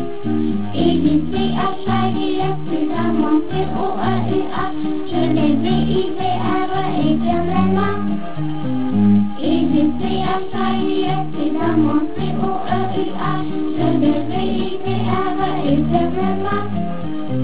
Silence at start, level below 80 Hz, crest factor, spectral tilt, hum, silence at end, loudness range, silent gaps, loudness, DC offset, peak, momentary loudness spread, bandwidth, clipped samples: 0 s; -40 dBFS; 16 dB; -11 dB/octave; none; 0 s; 2 LU; none; -19 LUFS; 7%; -2 dBFS; 6 LU; 4 kHz; under 0.1%